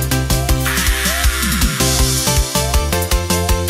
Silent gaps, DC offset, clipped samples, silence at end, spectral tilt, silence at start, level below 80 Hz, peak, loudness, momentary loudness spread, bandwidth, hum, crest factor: none; under 0.1%; under 0.1%; 0 s; -3.5 dB/octave; 0 s; -20 dBFS; -2 dBFS; -15 LUFS; 3 LU; 16.5 kHz; none; 14 dB